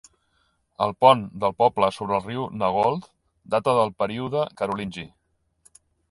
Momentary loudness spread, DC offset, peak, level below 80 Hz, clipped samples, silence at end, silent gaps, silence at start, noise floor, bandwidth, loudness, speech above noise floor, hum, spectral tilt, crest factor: 13 LU; under 0.1%; -2 dBFS; -58 dBFS; under 0.1%; 1.05 s; none; 0.8 s; -68 dBFS; 11.5 kHz; -23 LUFS; 46 dB; none; -6 dB/octave; 22 dB